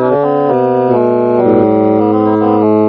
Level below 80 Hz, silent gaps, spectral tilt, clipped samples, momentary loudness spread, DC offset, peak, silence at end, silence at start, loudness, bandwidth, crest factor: -48 dBFS; none; -8 dB/octave; under 0.1%; 2 LU; under 0.1%; 0 dBFS; 0 s; 0 s; -11 LUFS; 5.2 kHz; 10 dB